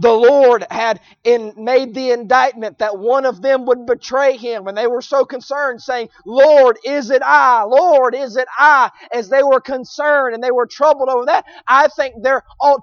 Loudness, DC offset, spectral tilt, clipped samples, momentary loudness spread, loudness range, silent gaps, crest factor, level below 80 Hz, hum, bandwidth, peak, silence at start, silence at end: -14 LUFS; under 0.1%; -3.5 dB/octave; under 0.1%; 10 LU; 5 LU; none; 14 dB; -60 dBFS; none; 7 kHz; 0 dBFS; 0 s; 0 s